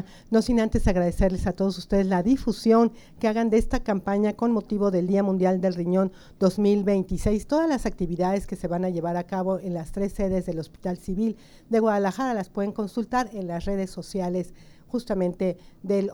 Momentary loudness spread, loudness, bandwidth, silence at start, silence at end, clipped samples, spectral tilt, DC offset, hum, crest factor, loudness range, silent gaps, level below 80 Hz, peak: 8 LU; -25 LUFS; 16.5 kHz; 0 s; 0 s; under 0.1%; -7.5 dB/octave; under 0.1%; none; 16 dB; 5 LU; none; -38 dBFS; -8 dBFS